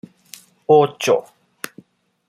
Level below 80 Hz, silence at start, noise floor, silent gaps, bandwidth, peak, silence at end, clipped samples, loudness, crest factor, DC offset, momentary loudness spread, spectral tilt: -70 dBFS; 0.7 s; -49 dBFS; none; 15.5 kHz; -2 dBFS; 1.1 s; under 0.1%; -17 LUFS; 20 dB; under 0.1%; 20 LU; -4.5 dB/octave